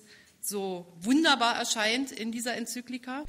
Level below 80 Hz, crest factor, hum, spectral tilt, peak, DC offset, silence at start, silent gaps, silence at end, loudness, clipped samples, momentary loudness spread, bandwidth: -74 dBFS; 18 dB; none; -2 dB/octave; -12 dBFS; under 0.1%; 0.1 s; none; 0 s; -28 LUFS; under 0.1%; 14 LU; 16 kHz